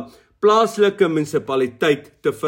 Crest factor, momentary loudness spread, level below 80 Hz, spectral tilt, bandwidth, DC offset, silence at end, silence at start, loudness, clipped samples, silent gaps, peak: 14 dB; 6 LU; -62 dBFS; -5 dB/octave; 16.5 kHz; under 0.1%; 0 s; 0 s; -18 LUFS; under 0.1%; none; -4 dBFS